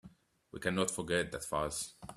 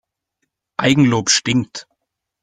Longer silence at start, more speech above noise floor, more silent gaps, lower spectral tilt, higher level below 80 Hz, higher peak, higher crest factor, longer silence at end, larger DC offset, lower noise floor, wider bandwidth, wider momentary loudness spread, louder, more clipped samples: second, 0.05 s vs 0.8 s; second, 24 dB vs 60 dB; neither; about the same, -3.5 dB/octave vs -4 dB/octave; second, -60 dBFS vs -54 dBFS; second, -16 dBFS vs -2 dBFS; about the same, 22 dB vs 18 dB; second, 0 s vs 0.6 s; neither; second, -60 dBFS vs -75 dBFS; first, 14.5 kHz vs 9.6 kHz; second, 7 LU vs 17 LU; second, -36 LUFS vs -15 LUFS; neither